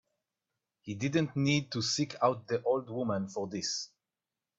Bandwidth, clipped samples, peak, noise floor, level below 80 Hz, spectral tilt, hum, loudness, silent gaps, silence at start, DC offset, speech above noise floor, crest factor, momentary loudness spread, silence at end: 8.2 kHz; under 0.1%; -14 dBFS; under -90 dBFS; -70 dBFS; -4.5 dB/octave; none; -32 LUFS; none; 0.85 s; under 0.1%; over 58 dB; 20 dB; 8 LU; 0.7 s